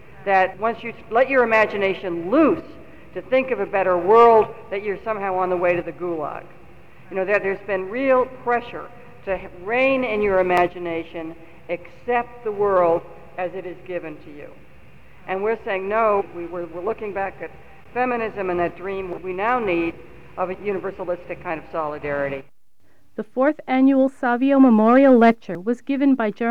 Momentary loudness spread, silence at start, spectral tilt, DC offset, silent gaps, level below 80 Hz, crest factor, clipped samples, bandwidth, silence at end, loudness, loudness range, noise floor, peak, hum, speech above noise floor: 16 LU; 0.2 s; -7.5 dB/octave; 0.7%; none; -52 dBFS; 18 dB; under 0.1%; 7.2 kHz; 0 s; -21 LUFS; 9 LU; -63 dBFS; -4 dBFS; none; 43 dB